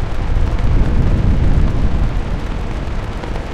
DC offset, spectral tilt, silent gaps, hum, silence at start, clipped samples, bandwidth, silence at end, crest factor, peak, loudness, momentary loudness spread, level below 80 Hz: under 0.1%; -8 dB/octave; none; none; 0 s; under 0.1%; 8 kHz; 0 s; 12 dB; -2 dBFS; -19 LUFS; 8 LU; -16 dBFS